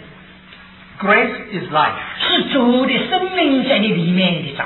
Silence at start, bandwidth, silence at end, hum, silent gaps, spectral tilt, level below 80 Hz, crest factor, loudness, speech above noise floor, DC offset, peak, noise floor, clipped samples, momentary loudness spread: 0 s; 4.3 kHz; 0 s; none; none; -8.5 dB/octave; -52 dBFS; 16 dB; -16 LUFS; 25 dB; under 0.1%; 0 dBFS; -41 dBFS; under 0.1%; 6 LU